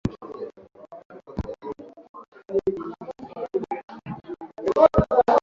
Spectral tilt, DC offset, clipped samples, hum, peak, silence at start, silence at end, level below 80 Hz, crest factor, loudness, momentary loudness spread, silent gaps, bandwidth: -8.5 dB/octave; under 0.1%; under 0.1%; none; -2 dBFS; 0.05 s; 0.05 s; -42 dBFS; 22 dB; -24 LUFS; 26 LU; 1.05-1.10 s, 2.09-2.14 s, 2.28-2.32 s, 3.84-3.88 s; 7.4 kHz